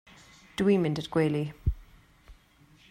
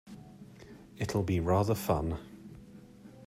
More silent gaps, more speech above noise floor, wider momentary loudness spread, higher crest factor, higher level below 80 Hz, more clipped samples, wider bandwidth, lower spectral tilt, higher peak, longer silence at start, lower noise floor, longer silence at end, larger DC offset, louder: neither; first, 33 dB vs 22 dB; second, 13 LU vs 24 LU; about the same, 18 dB vs 18 dB; first, -44 dBFS vs -52 dBFS; neither; about the same, 16 kHz vs 16 kHz; about the same, -7.5 dB/octave vs -7 dB/octave; about the same, -14 dBFS vs -16 dBFS; first, 0.6 s vs 0.05 s; first, -59 dBFS vs -52 dBFS; first, 0.6 s vs 0 s; neither; first, -28 LUFS vs -32 LUFS